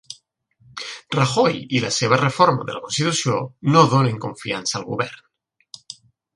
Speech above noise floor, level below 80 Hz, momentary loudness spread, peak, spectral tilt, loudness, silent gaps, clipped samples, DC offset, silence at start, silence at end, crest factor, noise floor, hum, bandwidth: 41 dB; -60 dBFS; 22 LU; 0 dBFS; -4.5 dB/octave; -20 LUFS; none; under 0.1%; under 0.1%; 0.1 s; 0.45 s; 20 dB; -60 dBFS; none; 11.5 kHz